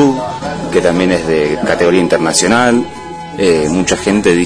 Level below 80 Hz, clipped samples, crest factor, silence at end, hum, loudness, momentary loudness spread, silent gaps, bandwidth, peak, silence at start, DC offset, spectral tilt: -38 dBFS; under 0.1%; 12 dB; 0 s; none; -12 LUFS; 10 LU; none; 11 kHz; 0 dBFS; 0 s; under 0.1%; -4.5 dB/octave